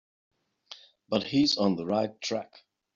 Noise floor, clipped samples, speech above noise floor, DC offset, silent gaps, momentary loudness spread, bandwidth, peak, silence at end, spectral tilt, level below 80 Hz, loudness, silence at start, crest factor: -52 dBFS; under 0.1%; 25 dB; under 0.1%; none; 23 LU; 7.6 kHz; -12 dBFS; 0.5 s; -4 dB/octave; -68 dBFS; -28 LUFS; 0.7 s; 18 dB